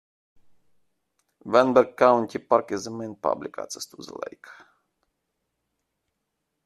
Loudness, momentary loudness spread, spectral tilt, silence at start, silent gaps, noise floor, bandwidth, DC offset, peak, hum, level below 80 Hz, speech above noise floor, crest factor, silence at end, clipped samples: -23 LUFS; 19 LU; -5 dB/octave; 1.45 s; none; -80 dBFS; 13 kHz; under 0.1%; -4 dBFS; none; -70 dBFS; 56 dB; 24 dB; 2.15 s; under 0.1%